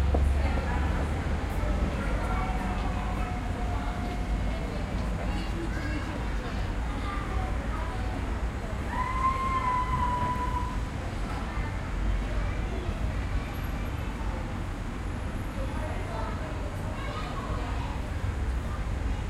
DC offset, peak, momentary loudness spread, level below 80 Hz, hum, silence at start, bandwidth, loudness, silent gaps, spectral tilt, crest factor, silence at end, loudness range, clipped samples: under 0.1%; -12 dBFS; 6 LU; -32 dBFS; none; 0 s; 12.5 kHz; -32 LUFS; none; -6.5 dB/octave; 16 dB; 0 s; 4 LU; under 0.1%